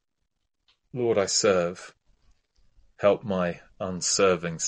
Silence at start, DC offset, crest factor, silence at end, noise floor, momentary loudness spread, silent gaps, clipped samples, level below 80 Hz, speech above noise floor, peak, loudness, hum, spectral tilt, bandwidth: 0.95 s; under 0.1%; 18 dB; 0 s; -79 dBFS; 13 LU; none; under 0.1%; -62 dBFS; 54 dB; -8 dBFS; -25 LUFS; none; -3.5 dB/octave; 11 kHz